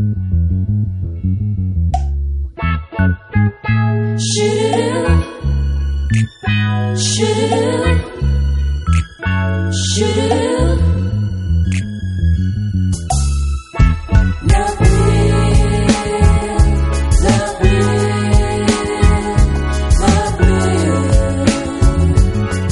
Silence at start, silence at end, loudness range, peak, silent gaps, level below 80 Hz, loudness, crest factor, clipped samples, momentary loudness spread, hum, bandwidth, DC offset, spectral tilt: 0 s; 0 s; 3 LU; 0 dBFS; none; -18 dBFS; -15 LUFS; 14 dB; under 0.1%; 6 LU; none; 11.5 kHz; under 0.1%; -6 dB/octave